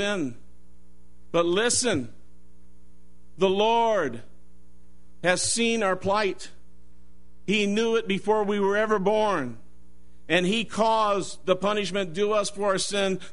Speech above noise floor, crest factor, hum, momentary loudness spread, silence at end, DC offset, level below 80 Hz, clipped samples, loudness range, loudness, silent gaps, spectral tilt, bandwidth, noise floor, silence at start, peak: 32 dB; 20 dB; none; 8 LU; 0.05 s; 1%; -56 dBFS; under 0.1%; 3 LU; -24 LUFS; none; -3.5 dB/octave; 11 kHz; -57 dBFS; 0 s; -6 dBFS